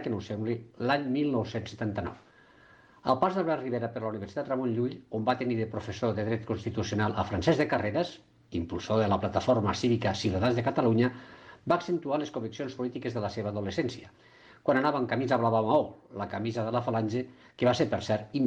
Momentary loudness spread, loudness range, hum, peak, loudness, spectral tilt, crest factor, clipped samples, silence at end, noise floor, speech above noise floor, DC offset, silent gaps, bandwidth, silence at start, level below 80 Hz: 10 LU; 4 LU; none; -12 dBFS; -30 LUFS; -6.5 dB/octave; 18 dB; under 0.1%; 0 s; -58 dBFS; 28 dB; under 0.1%; none; 8.8 kHz; 0 s; -60 dBFS